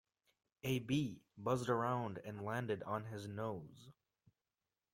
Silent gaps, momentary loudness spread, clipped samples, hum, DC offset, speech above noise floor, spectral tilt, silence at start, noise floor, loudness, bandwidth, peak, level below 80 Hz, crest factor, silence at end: none; 10 LU; under 0.1%; none; under 0.1%; over 49 dB; -6.5 dB/octave; 0.65 s; under -90 dBFS; -41 LUFS; 16.5 kHz; -22 dBFS; -74 dBFS; 22 dB; 1 s